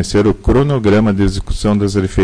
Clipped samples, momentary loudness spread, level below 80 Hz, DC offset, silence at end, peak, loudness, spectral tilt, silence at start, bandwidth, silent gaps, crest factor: under 0.1%; 4 LU; -24 dBFS; under 0.1%; 0 s; -4 dBFS; -14 LUFS; -7 dB/octave; 0 s; 10.5 kHz; none; 8 dB